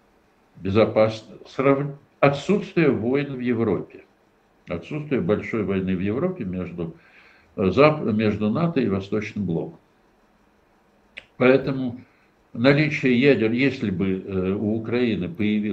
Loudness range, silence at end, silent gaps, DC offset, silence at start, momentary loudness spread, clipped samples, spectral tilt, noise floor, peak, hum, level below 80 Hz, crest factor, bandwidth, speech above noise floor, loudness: 5 LU; 0 s; none; under 0.1%; 0.55 s; 15 LU; under 0.1%; -8 dB/octave; -60 dBFS; -2 dBFS; none; -58 dBFS; 22 dB; 8.2 kHz; 39 dB; -22 LUFS